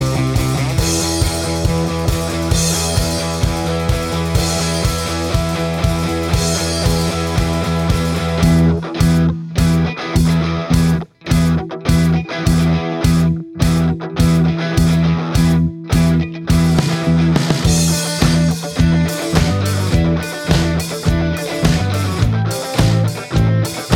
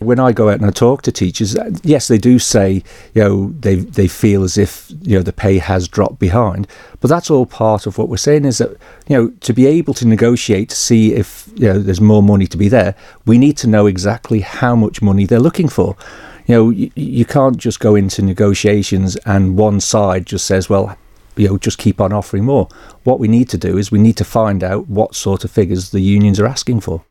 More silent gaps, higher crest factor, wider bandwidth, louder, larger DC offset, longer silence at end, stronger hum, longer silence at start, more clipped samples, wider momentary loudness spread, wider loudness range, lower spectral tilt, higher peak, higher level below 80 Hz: neither; about the same, 14 dB vs 12 dB; about the same, 16.5 kHz vs 16 kHz; second, -16 LUFS vs -13 LUFS; neither; about the same, 0 s vs 0.1 s; neither; about the same, 0 s vs 0 s; neither; second, 4 LU vs 7 LU; about the same, 2 LU vs 3 LU; about the same, -5.5 dB/octave vs -6 dB/octave; about the same, 0 dBFS vs 0 dBFS; first, -26 dBFS vs -38 dBFS